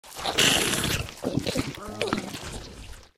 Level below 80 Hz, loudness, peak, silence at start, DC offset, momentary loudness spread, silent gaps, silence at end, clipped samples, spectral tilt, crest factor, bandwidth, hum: -46 dBFS; -25 LUFS; -8 dBFS; 0.05 s; under 0.1%; 19 LU; none; 0.1 s; under 0.1%; -2.5 dB/octave; 20 dB; 16.5 kHz; none